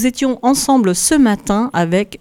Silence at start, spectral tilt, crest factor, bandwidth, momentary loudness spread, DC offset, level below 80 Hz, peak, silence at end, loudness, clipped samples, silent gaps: 0 s; -4 dB/octave; 14 dB; 17 kHz; 5 LU; under 0.1%; -40 dBFS; 0 dBFS; 0.05 s; -14 LUFS; under 0.1%; none